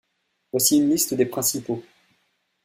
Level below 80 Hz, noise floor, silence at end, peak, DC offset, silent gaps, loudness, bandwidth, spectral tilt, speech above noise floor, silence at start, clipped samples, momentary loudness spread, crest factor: -64 dBFS; -73 dBFS; 0.85 s; -4 dBFS; under 0.1%; none; -21 LUFS; 16 kHz; -3.5 dB/octave; 52 dB; 0.55 s; under 0.1%; 13 LU; 20 dB